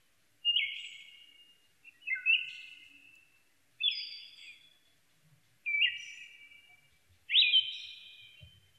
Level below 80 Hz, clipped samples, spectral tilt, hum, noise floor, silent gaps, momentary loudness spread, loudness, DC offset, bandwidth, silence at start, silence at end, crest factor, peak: -80 dBFS; under 0.1%; 2 dB/octave; none; -71 dBFS; none; 26 LU; -29 LUFS; under 0.1%; 13 kHz; 0.45 s; 0.3 s; 22 dB; -14 dBFS